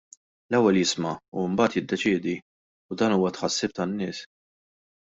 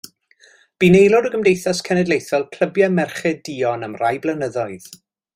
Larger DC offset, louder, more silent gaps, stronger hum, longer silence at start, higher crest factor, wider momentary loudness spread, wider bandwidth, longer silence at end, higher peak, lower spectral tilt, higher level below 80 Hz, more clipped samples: neither; second, -25 LUFS vs -18 LUFS; first, 1.28-1.32 s, 2.42-2.89 s vs none; neither; second, 0.5 s vs 0.8 s; about the same, 18 dB vs 18 dB; about the same, 11 LU vs 11 LU; second, 8 kHz vs 16 kHz; first, 0.9 s vs 0.4 s; second, -8 dBFS vs -2 dBFS; second, -4.5 dB/octave vs -6 dB/octave; second, -64 dBFS vs -54 dBFS; neither